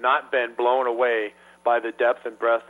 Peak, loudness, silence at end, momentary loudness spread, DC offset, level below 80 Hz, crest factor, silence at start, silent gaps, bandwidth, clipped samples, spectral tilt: -8 dBFS; -23 LUFS; 0.05 s; 5 LU; under 0.1%; -76 dBFS; 16 dB; 0 s; none; 10.5 kHz; under 0.1%; -4 dB/octave